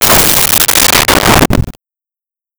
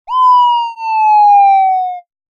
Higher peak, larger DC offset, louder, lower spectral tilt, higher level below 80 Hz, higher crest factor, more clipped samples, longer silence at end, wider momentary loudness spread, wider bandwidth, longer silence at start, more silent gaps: about the same, 0 dBFS vs -2 dBFS; neither; first, -6 LUFS vs -10 LUFS; first, -2.5 dB/octave vs 2.5 dB/octave; first, -24 dBFS vs -70 dBFS; about the same, 10 dB vs 8 dB; neither; first, 0.9 s vs 0.35 s; about the same, 8 LU vs 10 LU; first, over 20 kHz vs 7 kHz; about the same, 0 s vs 0.1 s; neither